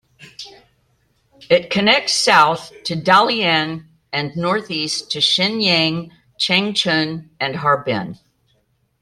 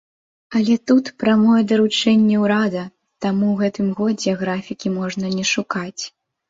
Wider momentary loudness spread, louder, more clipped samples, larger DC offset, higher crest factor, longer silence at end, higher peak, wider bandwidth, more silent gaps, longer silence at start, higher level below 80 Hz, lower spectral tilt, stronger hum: about the same, 13 LU vs 11 LU; about the same, -17 LUFS vs -19 LUFS; neither; neither; about the same, 18 dB vs 14 dB; first, 0.85 s vs 0.4 s; first, 0 dBFS vs -4 dBFS; first, 14.5 kHz vs 7.8 kHz; neither; second, 0.2 s vs 0.5 s; about the same, -60 dBFS vs -60 dBFS; second, -3.5 dB/octave vs -5 dB/octave; neither